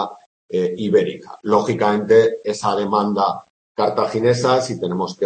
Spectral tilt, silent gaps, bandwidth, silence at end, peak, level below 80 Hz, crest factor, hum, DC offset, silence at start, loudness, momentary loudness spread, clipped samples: -5.5 dB/octave; 0.26-0.49 s, 3.50-3.75 s; 8.8 kHz; 0 s; -2 dBFS; -62 dBFS; 16 dB; none; under 0.1%; 0 s; -19 LUFS; 11 LU; under 0.1%